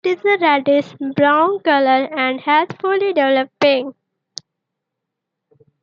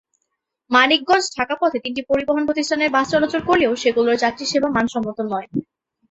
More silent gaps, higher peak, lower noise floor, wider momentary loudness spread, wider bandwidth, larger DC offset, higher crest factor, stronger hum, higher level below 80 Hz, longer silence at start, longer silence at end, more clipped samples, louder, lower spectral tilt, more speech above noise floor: neither; about the same, -2 dBFS vs 0 dBFS; first, -80 dBFS vs -76 dBFS; first, 16 LU vs 9 LU; second, 7.2 kHz vs 8.2 kHz; neither; about the same, 16 dB vs 18 dB; neither; second, -72 dBFS vs -54 dBFS; second, 0.05 s vs 0.7 s; first, 1.9 s vs 0.5 s; neither; first, -16 LUFS vs -19 LUFS; first, -5 dB/octave vs -3.5 dB/octave; first, 64 dB vs 57 dB